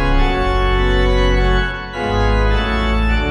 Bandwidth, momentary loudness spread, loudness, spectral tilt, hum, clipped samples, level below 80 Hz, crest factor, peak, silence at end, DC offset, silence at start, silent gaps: 8.8 kHz; 4 LU; -17 LUFS; -6.5 dB/octave; none; under 0.1%; -16 dBFS; 12 dB; -2 dBFS; 0 s; under 0.1%; 0 s; none